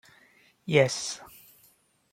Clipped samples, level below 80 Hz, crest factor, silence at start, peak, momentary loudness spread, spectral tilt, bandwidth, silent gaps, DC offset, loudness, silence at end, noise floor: under 0.1%; -70 dBFS; 24 dB; 0.65 s; -6 dBFS; 21 LU; -4 dB/octave; 16.5 kHz; none; under 0.1%; -26 LUFS; 0.85 s; -64 dBFS